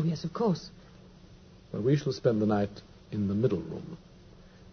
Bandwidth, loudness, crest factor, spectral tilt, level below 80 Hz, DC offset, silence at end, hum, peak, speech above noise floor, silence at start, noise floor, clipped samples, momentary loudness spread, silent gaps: 6.6 kHz; -30 LUFS; 20 dB; -8 dB/octave; -58 dBFS; under 0.1%; 0.1 s; none; -12 dBFS; 24 dB; 0 s; -53 dBFS; under 0.1%; 18 LU; none